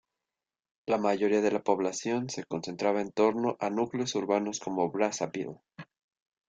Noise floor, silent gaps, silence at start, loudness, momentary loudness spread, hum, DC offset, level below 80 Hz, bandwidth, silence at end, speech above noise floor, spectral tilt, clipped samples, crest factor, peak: under -90 dBFS; none; 0.85 s; -30 LUFS; 9 LU; none; under 0.1%; -74 dBFS; 9.2 kHz; 0.65 s; over 61 dB; -4.5 dB/octave; under 0.1%; 20 dB; -10 dBFS